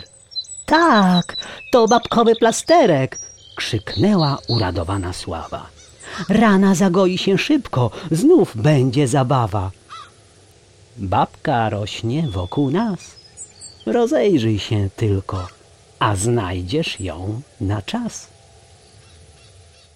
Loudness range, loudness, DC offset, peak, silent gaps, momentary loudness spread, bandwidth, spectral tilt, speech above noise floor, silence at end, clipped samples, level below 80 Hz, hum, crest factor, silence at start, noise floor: 8 LU; -18 LUFS; under 0.1%; -4 dBFS; none; 17 LU; 15 kHz; -5.5 dB/octave; 32 dB; 1.7 s; under 0.1%; -46 dBFS; none; 16 dB; 0 s; -49 dBFS